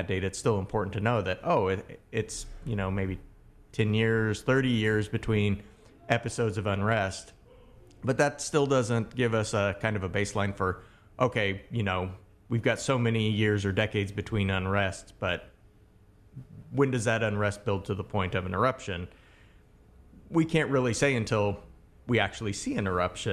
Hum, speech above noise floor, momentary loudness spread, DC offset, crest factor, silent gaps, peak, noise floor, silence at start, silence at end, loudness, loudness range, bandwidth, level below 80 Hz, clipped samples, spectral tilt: none; 30 dB; 10 LU; under 0.1%; 22 dB; none; -8 dBFS; -58 dBFS; 0 s; 0 s; -29 LUFS; 3 LU; 13 kHz; -48 dBFS; under 0.1%; -5.5 dB/octave